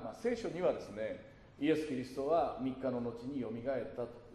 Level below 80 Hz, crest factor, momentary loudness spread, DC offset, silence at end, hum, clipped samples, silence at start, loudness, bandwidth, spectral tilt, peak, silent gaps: -64 dBFS; 16 dB; 10 LU; under 0.1%; 0 s; none; under 0.1%; 0 s; -37 LUFS; 13 kHz; -6.5 dB/octave; -20 dBFS; none